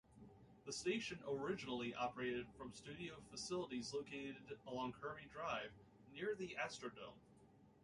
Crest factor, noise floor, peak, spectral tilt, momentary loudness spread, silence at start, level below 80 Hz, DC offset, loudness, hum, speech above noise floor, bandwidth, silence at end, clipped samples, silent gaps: 18 dB; -69 dBFS; -30 dBFS; -4 dB/octave; 15 LU; 0.1 s; -74 dBFS; under 0.1%; -47 LUFS; none; 21 dB; 11.5 kHz; 0.05 s; under 0.1%; none